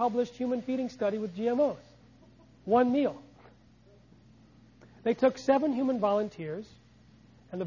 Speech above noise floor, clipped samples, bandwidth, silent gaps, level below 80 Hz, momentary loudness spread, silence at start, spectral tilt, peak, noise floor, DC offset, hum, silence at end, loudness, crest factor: 31 dB; under 0.1%; 7.4 kHz; none; -66 dBFS; 17 LU; 0 s; -7 dB/octave; -12 dBFS; -59 dBFS; under 0.1%; none; 0 s; -29 LUFS; 20 dB